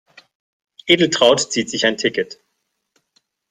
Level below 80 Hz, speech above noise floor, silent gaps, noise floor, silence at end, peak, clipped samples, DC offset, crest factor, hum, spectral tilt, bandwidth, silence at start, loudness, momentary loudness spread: -60 dBFS; 56 dB; none; -73 dBFS; 1.2 s; 0 dBFS; under 0.1%; under 0.1%; 20 dB; none; -3 dB/octave; 11.5 kHz; 0.85 s; -16 LUFS; 13 LU